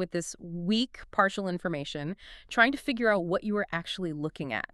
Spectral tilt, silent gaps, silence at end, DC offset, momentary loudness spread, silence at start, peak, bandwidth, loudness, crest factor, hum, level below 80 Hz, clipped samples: -4.5 dB/octave; none; 0.1 s; under 0.1%; 11 LU; 0 s; -6 dBFS; 12.5 kHz; -29 LUFS; 24 dB; none; -58 dBFS; under 0.1%